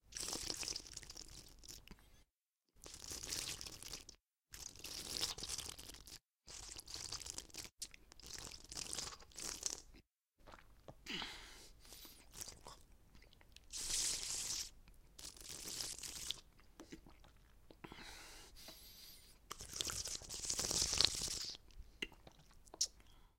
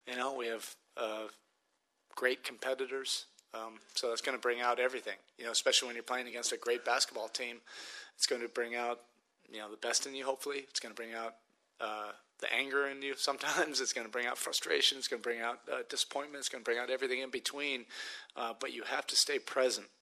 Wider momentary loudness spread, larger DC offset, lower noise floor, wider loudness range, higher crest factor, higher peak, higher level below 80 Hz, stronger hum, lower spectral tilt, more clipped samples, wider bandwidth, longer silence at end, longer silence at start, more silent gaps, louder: first, 21 LU vs 14 LU; neither; first, -89 dBFS vs -80 dBFS; first, 12 LU vs 5 LU; first, 36 dB vs 22 dB; about the same, -12 dBFS vs -14 dBFS; first, -62 dBFS vs under -90 dBFS; neither; about the same, -0.5 dB/octave vs 0.5 dB/octave; neither; first, 16.5 kHz vs 13.5 kHz; about the same, 0.1 s vs 0.15 s; about the same, 0.05 s vs 0.05 s; neither; second, -43 LUFS vs -35 LUFS